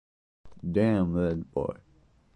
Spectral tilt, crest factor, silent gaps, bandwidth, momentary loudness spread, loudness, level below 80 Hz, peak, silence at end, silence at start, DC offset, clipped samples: -9.5 dB/octave; 18 dB; none; 10 kHz; 13 LU; -28 LUFS; -48 dBFS; -12 dBFS; 0.6 s; 0.45 s; under 0.1%; under 0.1%